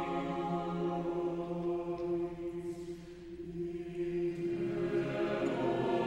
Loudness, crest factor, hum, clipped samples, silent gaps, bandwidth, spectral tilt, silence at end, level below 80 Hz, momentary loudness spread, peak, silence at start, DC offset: -36 LUFS; 14 dB; none; under 0.1%; none; 9 kHz; -7.5 dB/octave; 0 s; -60 dBFS; 10 LU; -20 dBFS; 0 s; under 0.1%